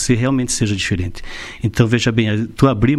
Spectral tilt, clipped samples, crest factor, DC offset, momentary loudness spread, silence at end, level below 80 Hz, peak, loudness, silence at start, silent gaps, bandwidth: -5.5 dB/octave; under 0.1%; 16 dB; under 0.1%; 11 LU; 0 s; -34 dBFS; 0 dBFS; -17 LUFS; 0 s; none; 12.5 kHz